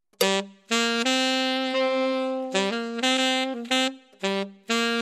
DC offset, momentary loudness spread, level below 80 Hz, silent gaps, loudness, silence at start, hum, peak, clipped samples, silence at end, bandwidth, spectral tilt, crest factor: under 0.1%; 6 LU; -74 dBFS; none; -24 LUFS; 0.2 s; none; -8 dBFS; under 0.1%; 0 s; 16 kHz; -2.5 dB/octave; 18 dB